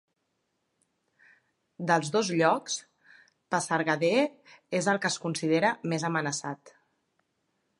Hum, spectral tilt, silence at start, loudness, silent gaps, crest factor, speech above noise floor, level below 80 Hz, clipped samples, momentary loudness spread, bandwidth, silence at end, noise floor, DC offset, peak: none; -4 dB/octave; 1.8 s; -28 LUFS; none; 22 dB; 51 dB; -80 dBFS; under 0.1%; 10 LU; 11.5 kHz; 1.1 s; -78 dBFS; under 0.1%; -8 dBFS